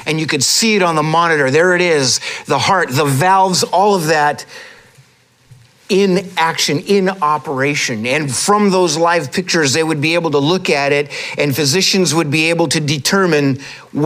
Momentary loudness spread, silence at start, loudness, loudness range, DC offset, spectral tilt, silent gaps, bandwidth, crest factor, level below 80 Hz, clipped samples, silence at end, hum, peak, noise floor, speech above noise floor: 5 LU; 0 s; -13 LUFS; 4 LU; under 0.1%; -3.5 dB/octave; none; 16 kHz; 12 dB; -60 dBFS; under 0.1%; 0 s; none; -2 dBFS; -51 dBFS; 37 dB